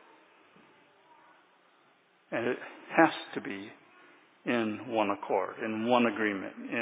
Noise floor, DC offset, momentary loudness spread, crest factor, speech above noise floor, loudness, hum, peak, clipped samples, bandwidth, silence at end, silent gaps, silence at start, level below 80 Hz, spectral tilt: -66 dBFS; under 0.1%; 13 LU; 26 dB; 35 dB; -31 LUFS; none; -8 dBFS; under 0.1%; 4 kHz; 0 s; none; 2.3 s; -80 dBFS; -3 dB/octave